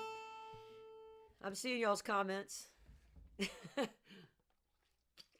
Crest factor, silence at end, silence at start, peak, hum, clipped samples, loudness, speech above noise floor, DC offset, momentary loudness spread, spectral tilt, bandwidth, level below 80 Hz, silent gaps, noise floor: 22 dB; 0.2 s; 0 s; -22 dBFS; none; under 0.1%; -42 LUFS; 40 dB; under 0.1%; 24 LU; -3.5 dB/octave; 18 kHz; -72 dBFS; none; -82 dBFS